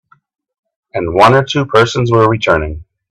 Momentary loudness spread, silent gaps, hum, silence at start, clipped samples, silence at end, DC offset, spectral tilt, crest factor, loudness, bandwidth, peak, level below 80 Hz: 15 LU; none; none; 0.95 s; under 0.1%; 0.3 s; under 0.1%; -6 dB/octave; 14 dB; -11 LUFS; 12 kHz; 0 dBFS; -36 dBFS